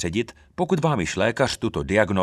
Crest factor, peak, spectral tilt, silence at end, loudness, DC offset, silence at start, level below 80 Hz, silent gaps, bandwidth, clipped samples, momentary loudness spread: 20 dB; -2 dBFS; -5.5 dB/octave; 0 s; -23 LUFS; under 0.1%; 0 s; -44 dBFS; none; 13 kHz; under 0.1%; 7 LU